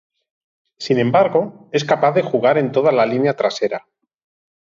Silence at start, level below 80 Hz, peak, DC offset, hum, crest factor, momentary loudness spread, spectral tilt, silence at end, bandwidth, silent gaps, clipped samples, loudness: 0.8 s; -66 dBFS; -2 dBFS; under 0.1%; none; 16 dB; 8 LU; -6 dB/octave; 0.9 s; 7.6 kHz; none; under 0.1%; -17 LUFS